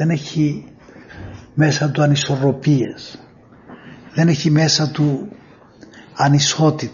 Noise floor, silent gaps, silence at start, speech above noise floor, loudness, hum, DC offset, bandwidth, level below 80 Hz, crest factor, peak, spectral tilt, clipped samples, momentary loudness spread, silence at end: -44 dBFS; none; 0 s; 28 dB; -17 LUFS; none; under 0.1%; 7.4 kHz; -52 dBFS; 16 dB; -2 dBFS; -5.5 dB/octave; under 0.1%; 21 LU; 0 s